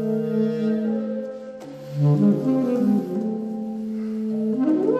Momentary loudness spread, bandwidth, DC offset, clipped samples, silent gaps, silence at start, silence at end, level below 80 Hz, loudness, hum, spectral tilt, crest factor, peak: 13 LU; 8 kHz; under 0.1%; under 0.1%; none; 0 s; 0 s; -68 dBFS; -23 LUFS; none; -10 dB/octave; 14 dB; -8 dBFS